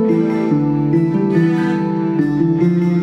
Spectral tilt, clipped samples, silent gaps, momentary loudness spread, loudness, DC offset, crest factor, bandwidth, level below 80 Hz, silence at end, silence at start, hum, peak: -9.5 dB/octave; under 0.1%; none; 2 LU; -16 LUFS; under 0.1%; 12 dB; 6.6 kHz; -50 dBFS; 0 s; 0 s; none; -4 dBFS